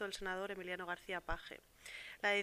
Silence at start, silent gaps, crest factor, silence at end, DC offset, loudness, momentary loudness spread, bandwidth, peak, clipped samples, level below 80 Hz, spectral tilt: 0 s; none; 20 dB; 0 s; under 0.1%; -43 LUFS; 13 LU; 15.5 kHz; -22 dBFS; under 0.1%; -58 dBFS; -3 dB/octave